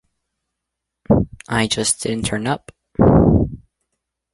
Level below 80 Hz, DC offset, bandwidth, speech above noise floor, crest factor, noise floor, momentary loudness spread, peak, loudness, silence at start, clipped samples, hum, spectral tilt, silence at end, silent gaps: -32 dBFS; under 0.1%; 11.5 kHz; 61 dB; 18 dB; -80 dBFS; 12 LU; -2 dBFS; -18 LUFS; 1.1 s; under 0.1%; none; -5 dB/octave; 0.75 s; none